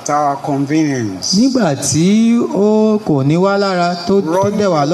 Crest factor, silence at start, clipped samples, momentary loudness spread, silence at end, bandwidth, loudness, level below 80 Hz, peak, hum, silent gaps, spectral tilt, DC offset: 10 dB; 0 s; under 0.1%; 4 LU; 0 s; 13 kHz; -14 LUFS; -54 dBFS; -2 dBFS; none; none; -5.5 dB/octave; under 0.1%